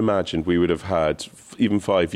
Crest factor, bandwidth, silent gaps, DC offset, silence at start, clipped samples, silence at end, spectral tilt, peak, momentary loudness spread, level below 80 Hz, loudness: 14 dB; 13 kHz; none; under 0.1%; 0 s; under 0.1%; 0 s; -6 dB/octave; -8 dBFS; 6 LU; -46 dBFS; -22 LUFS